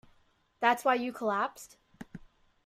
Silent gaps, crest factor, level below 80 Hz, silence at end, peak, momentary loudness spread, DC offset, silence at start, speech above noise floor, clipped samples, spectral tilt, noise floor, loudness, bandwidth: none; 22 dB; -68 dBFS; 0.5 s; -10 dBFS; 24 LU; under 0.1%; 0.6 s; 38 dB; under 0.1%; -4 dB/octave; -68 dBFS; -30 LUFS; 15.5 kHz